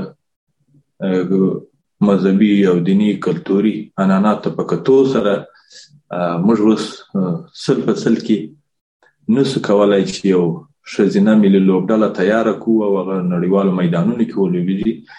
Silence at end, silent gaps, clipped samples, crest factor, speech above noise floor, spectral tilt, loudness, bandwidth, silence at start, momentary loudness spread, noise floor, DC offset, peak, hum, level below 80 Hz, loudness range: 0.15 s; 0.36-0.47 s, 8.81-9.00 s; under 0.1%; 14 dB; 42 dB; -7.5 dB/octave; -15 LUFS; 10 kHz; 0 s; 9 LU; -57 dBFS; under 0.1%; -2 dBFS; none; -56 dBFS; 4 LU